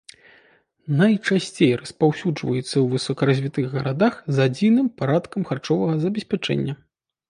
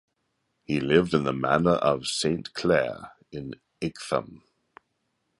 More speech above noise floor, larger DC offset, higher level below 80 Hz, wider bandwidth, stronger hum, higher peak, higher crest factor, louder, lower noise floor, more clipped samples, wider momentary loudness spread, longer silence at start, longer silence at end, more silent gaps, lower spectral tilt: second, 37 dB vs 51 dB; neither; about the same, -60 dBFS vs -56 dBFS; about the same, 11 kHz vs 11.5 kHz; neither; about the same, -4 dBFS vs -6 dBFS; about the same, 18 dB vs 22 dB; first, -22 LUFS vs -25 LUFS; second, -58 dBFS vs -76 dBFS; neither; second, 7 LU vs 17 LU; first, 0.85 s vs 0.7 s; second, 0.55 s vs 1.05 s; neither; first, -6.5 dB/octave vs -5 dB/octave